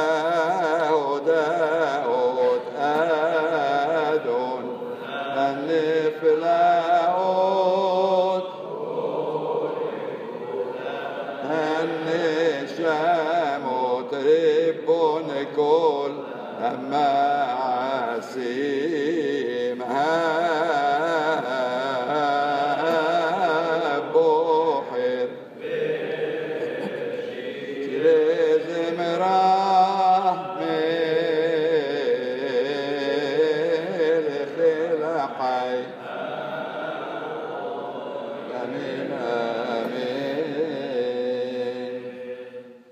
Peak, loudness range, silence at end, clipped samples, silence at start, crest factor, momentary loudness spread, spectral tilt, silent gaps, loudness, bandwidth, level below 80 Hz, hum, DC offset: -8 dBFS; 7 LU; 0.15 s; under 0.1%; 0 s; 16 dB; 11 LU; -5.5 dB/octave; none; -23 LUFS; 8.2 kHz; -84 dBFS; none; under 0.1%